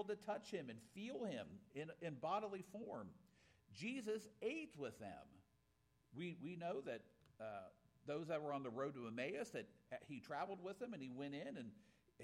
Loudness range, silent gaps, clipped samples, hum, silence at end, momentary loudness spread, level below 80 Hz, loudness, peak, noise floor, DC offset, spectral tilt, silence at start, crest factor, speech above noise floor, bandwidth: 3 LU; none; under 0.1%; none; 0 s; 11 LU; -84 dBFS; -50 LUFS; -30 dBFS; -80 dBFS; under 0.1%; -5.5 dB/octave; 0 s; 20 dB; 31 dB; 15.5 kHz